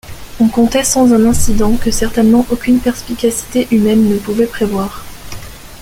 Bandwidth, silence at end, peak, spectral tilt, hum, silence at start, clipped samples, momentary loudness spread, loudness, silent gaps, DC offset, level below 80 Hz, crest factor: 16.5 kHz; 0 s; 0 dBFS; -5 dB/octave; none; 0.05 s; under 0.1%; 20 LU; -13 LUFS; none; under 0.1%; -26 dBFS; 12 dB